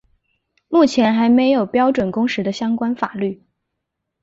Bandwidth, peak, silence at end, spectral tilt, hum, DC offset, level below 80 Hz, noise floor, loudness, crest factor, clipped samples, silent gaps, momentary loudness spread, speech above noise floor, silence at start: 7.8 kHz; -2 dBFS; 0.9 s; -6 dB/octave; none; under 0.1%; -58 dBFS; -78 dBFS; -17 LUFS; 16 dB; under 0.1%; none; 9 LU; 61 dB; 0.7 s